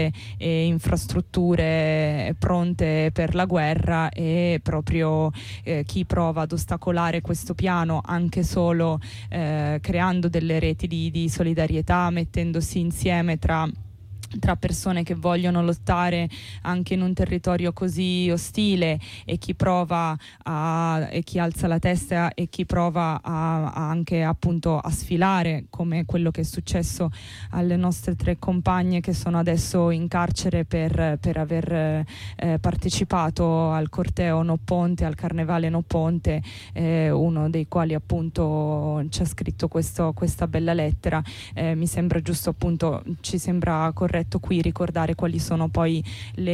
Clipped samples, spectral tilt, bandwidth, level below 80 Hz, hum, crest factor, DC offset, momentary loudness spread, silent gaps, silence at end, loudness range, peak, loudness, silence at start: under 0.1%; -6.5 dB/octave; 15 kHz; -38 dBFS; none; 12 dB; under 0.1%; 5 LU; none; 0 s; 2 LU; -10 dBFS; -24 LUFS; 0 s